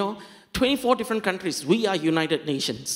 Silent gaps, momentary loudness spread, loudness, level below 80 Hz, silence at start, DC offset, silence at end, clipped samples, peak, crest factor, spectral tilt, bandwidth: none; 7 LU; -24 LUFS; -52 dBFS; 0 s; under 0.1%; 0 s; under 0.1%; -6 dBFS; 18 dB; -4 dB/octave; 16 kHz